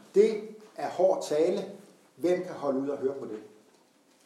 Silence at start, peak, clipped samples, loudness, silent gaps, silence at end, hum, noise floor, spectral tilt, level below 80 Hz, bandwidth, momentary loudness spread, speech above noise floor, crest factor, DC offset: 0.15 s; -10 dBFS; under 0.1%; -29 LUFS; none; 0.8 s; none; -63 dBFS; -5.5 dB/octave; under -90 dBFS; 13 kHz; 17 LU; 35 dB; 20 dB; under 0.1%